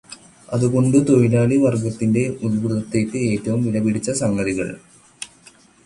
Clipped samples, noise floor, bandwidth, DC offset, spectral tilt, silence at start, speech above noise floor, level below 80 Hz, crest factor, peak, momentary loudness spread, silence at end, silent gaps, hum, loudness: under 0.1%; -50 dBFS; 11.5 kHz; under 0.1%; -7 dB/octave; 0.1 s; 32 dB; -50 dBFS; 16 dB; -2 dBFS; 20 LU; 0.6 s; none; none; -19 LUFS